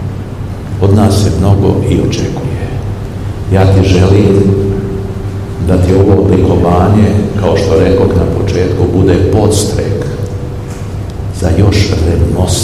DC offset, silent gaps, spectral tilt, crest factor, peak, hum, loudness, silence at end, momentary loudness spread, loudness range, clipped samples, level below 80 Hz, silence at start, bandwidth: 0.9%; none; -7 dB/octave; 10 dB; 0 dBFS; none; -10 LUFS; 0 s; 12 LU; 3 LU; 2%; -22 dBFS; 0 s; 13 kHz